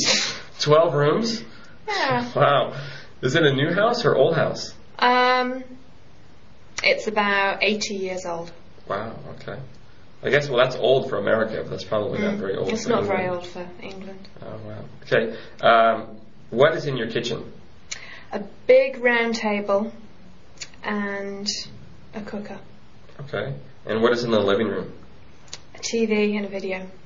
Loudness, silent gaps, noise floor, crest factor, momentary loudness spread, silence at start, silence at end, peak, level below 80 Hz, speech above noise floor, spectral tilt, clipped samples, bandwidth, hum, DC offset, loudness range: -22 LUFS; none; -51 dBFS; 20 dB; 20 LU; 0 s; 0.15 s; -4 dBFS; -56 dBFS; 29 dB; -3 dB/octave; under 0.1%; 7.6 kHz; none; 1%; 6 LU